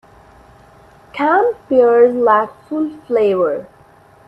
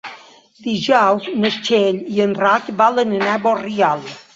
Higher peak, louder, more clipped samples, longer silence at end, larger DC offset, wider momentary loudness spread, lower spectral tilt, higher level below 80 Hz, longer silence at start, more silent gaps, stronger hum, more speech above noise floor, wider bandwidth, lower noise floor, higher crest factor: about the same, 0 dBFS vs -2 dBFS; about the same, -15 LUFS vs -17 LUFS; neither; first, 0.6 s vs 0.15 s; neither; first, 11 LU vs 8 LU; first, -7 dB/octave vs -5 dB/octave; first, -56 dBFS vs -62 dBFS; first, 1.15 s vs 0.05 s; neither; neither; first, 33 dB vs 23 dB; second, 5.2 kHz vs 7.8 kHz; first, -47 dBFS vs -40 dBFS; about the same, 16 dB vs 16 dB